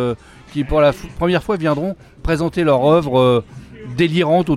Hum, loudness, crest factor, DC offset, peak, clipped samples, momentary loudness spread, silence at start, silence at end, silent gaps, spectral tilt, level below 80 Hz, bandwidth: none; -17 LUFS; 14 dB; under 0.1%; -2 dBFS; under 0.1%; 15 LU; 0 s; 0 s; none; -7 dB/octave; -36 dBFS; 13.5 kHz